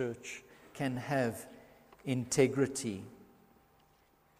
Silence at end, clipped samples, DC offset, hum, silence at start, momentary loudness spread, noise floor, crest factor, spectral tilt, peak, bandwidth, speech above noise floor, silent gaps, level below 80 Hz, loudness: 1.15 s; under 0.1%; under 0.1%; none; 0 s; 20 LU; -68 dBFS; 24 dB; -5 dB/octave; -12 dBFS; 15.5 kHz; 34 dB; none; -70 dBFS; -34 LUFS